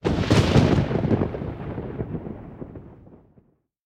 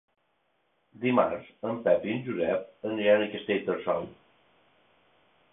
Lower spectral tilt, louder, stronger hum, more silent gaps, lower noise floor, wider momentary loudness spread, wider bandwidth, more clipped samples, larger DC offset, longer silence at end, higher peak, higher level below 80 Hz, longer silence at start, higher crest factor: second, -7 dB/octave vs -10 dB/octave; first, -23 LUFS vs -28 LUFS; neither; neither; second, -60 dBFS vs -73 dBFS; first, 21 LU vs 10 LU; first, 12.5 kHz vs 3.9 kHz; neither; neither; second, 0.7 s vs 1.4 s; first, -4 dBFS vs -8 dBFS; first, -38 dBFS vs -68 dBFS; second, 0.05 s vs 1 s; about the same, 20 dB vs 22 dB